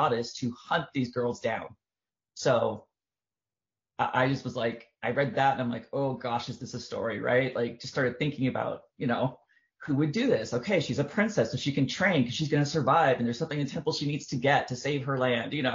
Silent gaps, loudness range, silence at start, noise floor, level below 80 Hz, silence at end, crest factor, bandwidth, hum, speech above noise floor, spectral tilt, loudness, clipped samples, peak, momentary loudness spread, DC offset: none; 5 LU; 0 s; under -90 dBFS; -66 dBFS; 0 s; 20 dB; 7.4 kHz; none; over 62 dB; -4.5 dB/octave; -29 LUFS; under 0.1%; -10 dBFS; 8 LU; under 0.1%